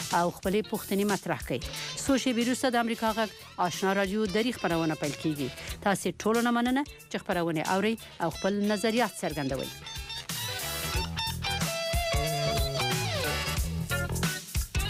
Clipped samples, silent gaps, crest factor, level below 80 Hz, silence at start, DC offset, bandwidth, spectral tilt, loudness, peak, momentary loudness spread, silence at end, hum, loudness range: under 0.1%; none; 14 dB; -42 dBFS; 0 s; under 0.1%; 16 kHz; -4.5 dB/octave; -29 LUFS; -16 dBFS; 6 LU; 0 s; none; 2 LU